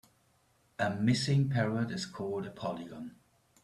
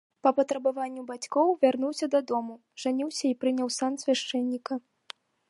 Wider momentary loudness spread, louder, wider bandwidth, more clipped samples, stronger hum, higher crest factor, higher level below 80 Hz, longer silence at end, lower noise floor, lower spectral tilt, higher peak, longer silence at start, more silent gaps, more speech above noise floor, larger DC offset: first, 17 LU vs 12 LU; second, -33 LUFS vs -28 LUFS; about the same, 12 kHz vs 11.5 kHz; neither; neither; about the same, 18 dB vs 20 dB; first, -66 dBFS vs -84 dBFS; second, 0.5 s vs 0.7 s; first, -70 dBFS vs -50 dBFS; first, -6 dB/octave vs -3 dB/octave; second, -16 dBFS vs -10 dBFS; first, 0.8 s vs 0.25 s; neither; first, 38 dB vs 23 dB; neither